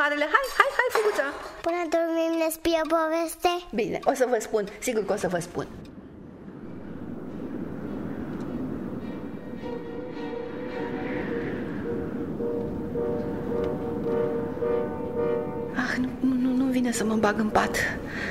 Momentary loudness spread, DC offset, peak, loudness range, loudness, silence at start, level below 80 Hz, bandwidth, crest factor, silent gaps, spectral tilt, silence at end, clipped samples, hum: 13 LU; under 0.1%; -2 dBFS; 9 LU; -27 LUFS; 0 s; -50 dBFS; 16 kHz; 26 dB; none; -5 dB/octave; 0 s; under 0.1%; none